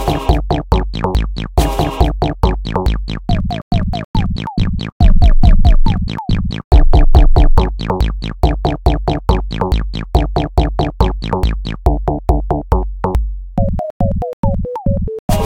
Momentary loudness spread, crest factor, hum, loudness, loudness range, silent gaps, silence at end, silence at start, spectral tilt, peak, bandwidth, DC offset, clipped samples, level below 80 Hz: 7 LU; 12 dB; none; -16 LUFS; 4 LU; 3.62-3.71 s, 4.05-4.14 s, 4.92-5.00 s, 6.64-6.71 s, 13.90-14.00 s, 14.33-14.43 s, 15.19-15.28 s; 0 s; 0 s; -7.5 dB/octave; 0 dBFS; 12.5 kHz; 0.4%; 0.2%; -14 dBFS